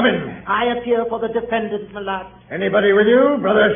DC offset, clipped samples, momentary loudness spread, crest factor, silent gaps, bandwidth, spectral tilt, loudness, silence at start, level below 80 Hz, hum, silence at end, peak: under 0.1%; under 0.1%; 13 LU; 16 dB; none; 3.7 kHz; -10.5 dB/octave; -18 LUFS; 0 s; -50 dBFS; none; 0 s; -2 dBFS